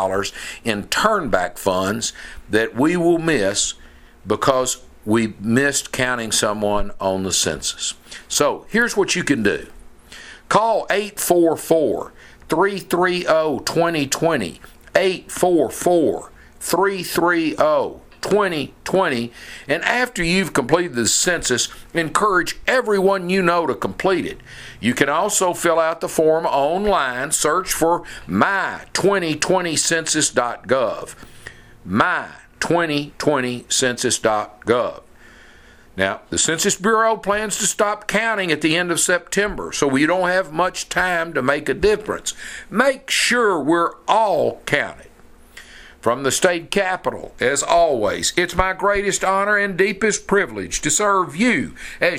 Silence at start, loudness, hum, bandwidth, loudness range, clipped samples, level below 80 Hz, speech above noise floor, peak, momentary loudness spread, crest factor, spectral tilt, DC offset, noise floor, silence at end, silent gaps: 0 s; -19 LUFS; none; 16 kHz; 2 LU; under 0.1%; -44 dBFS; 27 dB; 0 dBFS; 8 LU; 20 dB; -3 dB/octave; under 0.1%; -46 dBFS; 0 s; none